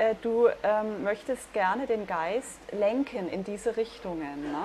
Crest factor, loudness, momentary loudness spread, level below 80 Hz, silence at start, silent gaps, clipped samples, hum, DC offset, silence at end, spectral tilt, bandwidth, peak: 18 dB; -29 LUFS; 9 LU; -60 dBFS; 0 s; none; under 0.1%; none; under 0.1%; 0 s; -5 dB/octave; 13 kHz; -12 dBFS